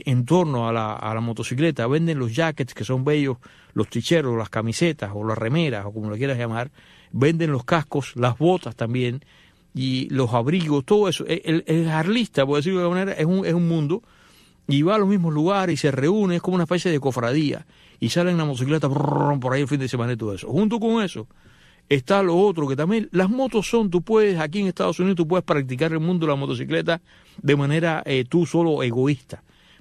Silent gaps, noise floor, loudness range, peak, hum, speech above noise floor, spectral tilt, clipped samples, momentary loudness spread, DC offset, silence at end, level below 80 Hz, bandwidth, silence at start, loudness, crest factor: none; -54 dBFS; 3 LU; -6 dBFS; none; 32 dB; -6.5 dB/octave; under 0.1%; 7 LU; under 0.1%; 0.45 s; -56 dBFS; 13.5 kHz; 0.05 s; -22 LUFS; 16 dB